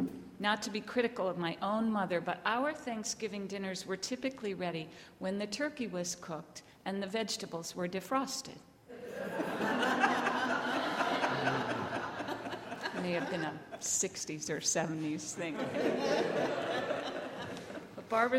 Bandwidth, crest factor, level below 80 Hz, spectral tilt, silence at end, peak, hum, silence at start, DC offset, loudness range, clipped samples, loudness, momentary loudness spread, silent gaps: 16 kHz; 20 dB; -74 dBFS; -3.5 dB/octave; 0 s; -16 dBFS; none; 0 s; under 0.1%; 5 LU; under 0.1%; -35 LUFS; 10 LU; none